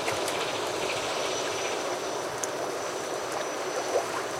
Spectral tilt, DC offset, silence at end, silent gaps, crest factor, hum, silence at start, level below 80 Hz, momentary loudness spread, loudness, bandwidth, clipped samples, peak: -2 dB/octave; under 0.1%; 0 s; none; 20 dB; none; 0 s; -66 dBFS; 3 LU; -30 LUFS; 16.5 kHz; under 0.1%; -10 dBFS